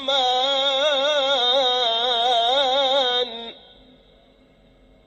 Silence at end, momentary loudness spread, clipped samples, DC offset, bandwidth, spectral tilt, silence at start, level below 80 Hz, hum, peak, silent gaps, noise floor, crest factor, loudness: 1.5 s; 5 LU; under 0.1%; under 0.1%; 8.4 kHz; -0.5 dB/octave; 0 s; -60 dBFS; none; -8 dBFS; none; -54 dBFS; 14 dB; -19 LUFS